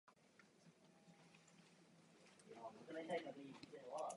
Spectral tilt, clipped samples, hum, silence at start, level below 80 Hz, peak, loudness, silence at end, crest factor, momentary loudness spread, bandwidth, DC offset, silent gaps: -4.5 dB/octave; under 0.1%; none; 0.05 s; under -90 dBFS; -34 dBFS; -53 LUFS; 0 s; 22 dB; 21 LU; 11 kHz; under 0.1%; none